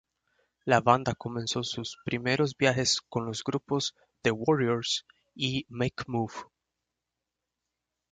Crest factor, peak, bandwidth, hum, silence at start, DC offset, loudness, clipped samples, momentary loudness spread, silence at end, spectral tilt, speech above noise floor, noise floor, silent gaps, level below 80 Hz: 24 dB; -6 dBFS; 9.4 kHz; none; 0.65 s; under 0.1%; -29 LUFS; under 0.1%; 9 LU; 1.7 s; -4 dB/octave; 58 dB; -87 dBFS; none; -62 dBFS